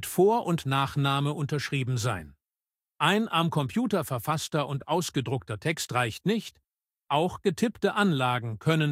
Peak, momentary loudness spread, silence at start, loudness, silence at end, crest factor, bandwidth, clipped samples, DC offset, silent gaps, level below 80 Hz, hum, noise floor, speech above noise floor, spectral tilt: -8 dBFS; 6 LU; 0 s; -27 LUFS; 0 s; 20 dB; 16 kHz; under 0.1%; under 0.1%; none; -60 dBFS; none; under -90 dBFS; over 63 dB; -5.5 dB/octave